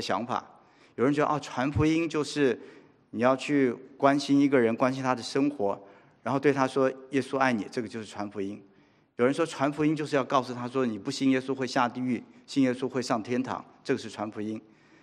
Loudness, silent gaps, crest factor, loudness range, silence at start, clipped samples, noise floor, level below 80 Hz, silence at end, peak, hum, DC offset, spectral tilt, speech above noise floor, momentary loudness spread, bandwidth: -28 LUFS; none; 20 dB; 4 LU; 0 s; under 0.1%; -62 dBFS; -62 dBFS; 0.45 s; -8 dBFS; none; under 0.1%; -6 dB/octave; 34 dB; 12 LU; 11 kHz